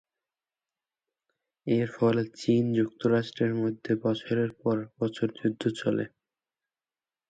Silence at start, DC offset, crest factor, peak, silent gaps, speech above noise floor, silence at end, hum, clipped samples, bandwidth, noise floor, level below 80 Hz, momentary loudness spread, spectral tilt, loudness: 1.65 s; under 0.1%; 18 dB; -12 dBFS; none; over 63 dB; 1.2 s; none; under 0.1%; 9 kHz; under -90 dBFS; -70 dBFS; 5 LU; -7.5 dB/octave; -28 LUFS